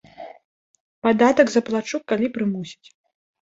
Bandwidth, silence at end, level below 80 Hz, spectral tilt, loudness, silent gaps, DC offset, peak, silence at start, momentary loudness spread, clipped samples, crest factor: 7.8 kHz; 0.7 s; -64 dBFS; -5.5 dB/octave; -21 LUFS; 0.44-0.74 s, 0.80-1.02 s; under 0.1%; -2 dBFS; 0.2 s; 24 LU; under 0.1%; 20 dB